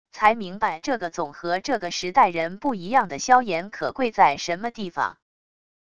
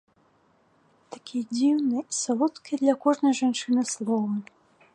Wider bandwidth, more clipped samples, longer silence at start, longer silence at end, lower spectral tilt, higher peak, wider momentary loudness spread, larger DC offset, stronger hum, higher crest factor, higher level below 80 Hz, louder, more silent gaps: second, 10 kHz vs 11.5 kHz; neither; second, 0.05 s vs 1.1 s; first, 0.7 s vs 0.5 s; about the same, -3.5 dB/octave vs -4 dB/octave; first, -4 dBFS vs -8 dBFS; about the same, 9 LU vs 11 LU; first, 0.5% vs under 0.1%; neither; about the same, 20 dB vs 18 dB; first, -60 dBFS vs -80 dBFS; first, -23 LUFS vs -26 LUFS; neither